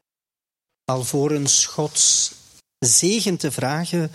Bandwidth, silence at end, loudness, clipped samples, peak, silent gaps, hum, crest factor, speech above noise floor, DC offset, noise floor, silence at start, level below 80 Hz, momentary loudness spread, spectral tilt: 15.5 kHz; 0 s; -18 LUFS; under 0.1%; -4 dBFS; none; none; 18 dB; over 70 dB; under 0.1%; under -90 dBFS; 0.9 s; -60 dBFS; 9 LU; -2.5 dB/octave